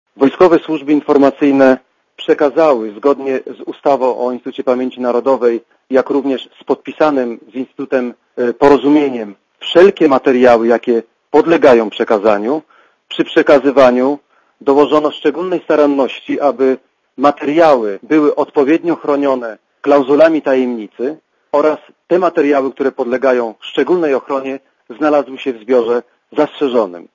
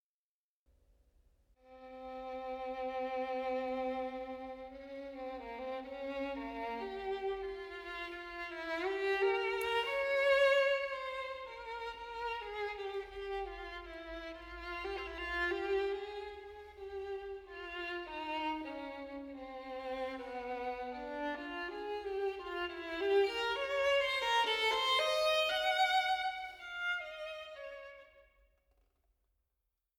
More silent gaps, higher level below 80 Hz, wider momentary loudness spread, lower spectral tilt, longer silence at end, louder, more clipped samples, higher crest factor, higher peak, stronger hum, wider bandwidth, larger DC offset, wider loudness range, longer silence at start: neither; first, -54 dBFS vs -62 dBFS; second, 12 LU vs 16 LU; first, -6 dB/octave vs -2.5 dB/octave; second, 0.1 s vs 1.8 s; first, -13 LUFS vs -37 LUFS; first, 0.3% vs under 0.1%; second, 12 dB vs 18 dB; first, 0 dBFS vs -20 dBFS; neither; second, 7.4 kHz vs 18.5 kHz; neither; second, 5 LU vs 11 LU; second, 0.2 s vs 1.65 s